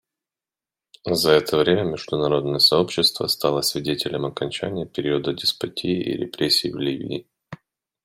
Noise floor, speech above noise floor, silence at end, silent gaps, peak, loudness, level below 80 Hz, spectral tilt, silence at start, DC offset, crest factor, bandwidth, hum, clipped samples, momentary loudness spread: under -90 dBFS; over 68 dB; 0.5 s; none; -4 dBFS; -21 LUFS; -56 dBFS; -4 dB/octave; 1.05 s; under 0.1%; 20 dB; 16 kHz; none; under 0.1%; 11 LU